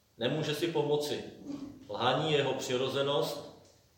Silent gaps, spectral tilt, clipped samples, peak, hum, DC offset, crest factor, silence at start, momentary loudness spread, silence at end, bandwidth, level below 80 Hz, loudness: none; -4.5 dB/octave; under 0.1%; -14 dBFS; none; under 0.1%; 20 dB; 0.2 s; 14 LU; 0.4 s; 16.5 kHz; -70 dBFS; -32 LUFS